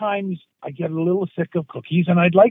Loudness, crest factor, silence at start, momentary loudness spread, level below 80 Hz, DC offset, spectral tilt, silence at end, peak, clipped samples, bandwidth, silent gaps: -21 LUFS; 18 dB; 0 s; 14 LU; -66 dBFS; under 0.1%; -10.5 dB/octave; 0 s; -2 dBFS; under 0.1%; 3.8 kHz; none